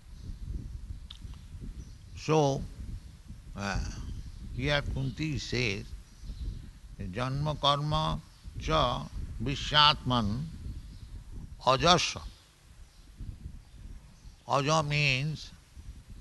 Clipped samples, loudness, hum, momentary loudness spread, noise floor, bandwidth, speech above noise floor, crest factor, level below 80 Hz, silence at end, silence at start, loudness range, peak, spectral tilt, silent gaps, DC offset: under 0.1%; -29 LUFS; none; 23 LU; -54 dBFS; 12 kHz; 26 dB; 28 dB; -44 dBFS; 0.05 s; 0.05 s; 7 LU; -4 dBFS; -4.5 dB/octave; none; under 0.1%